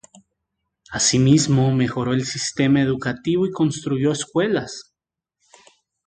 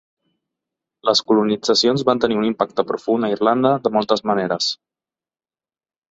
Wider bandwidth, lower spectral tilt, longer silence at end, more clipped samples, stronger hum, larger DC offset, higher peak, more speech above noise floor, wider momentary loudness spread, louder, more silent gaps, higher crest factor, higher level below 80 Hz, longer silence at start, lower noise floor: first, 9.6 kHz vs 8 kHz; about the same, -5 dB/octave vs -4.5 dB/octave; second, 1.25 s vs 1.4 s; neither; neither; neither; about the same, -4 dBFS vs -2 dBFS; second, 65 dB vs over 72 dB; first, 9 LU vs 5 LU; about the same, -20 LUFS vs -18 LUFS; neither; about the same, 18 dB vs 18 dB; first, -52 dBFS vs -60 dBFS; second, 0.9 s vs 1.05 s; second, -84 dBFS vs under -90 dBFS